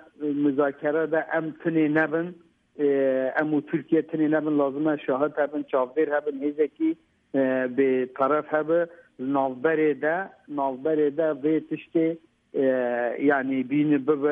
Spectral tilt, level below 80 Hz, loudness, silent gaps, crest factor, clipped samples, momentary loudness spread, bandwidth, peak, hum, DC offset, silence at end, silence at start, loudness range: -10 dB/octave; -76 dBFS; -25 LUFS; none; 16 dB; under 0.1%; 6 LU; 3.7 kHz; -8 dBFS; none; under 0.1%; 0 s; 0.2 s; 1 LU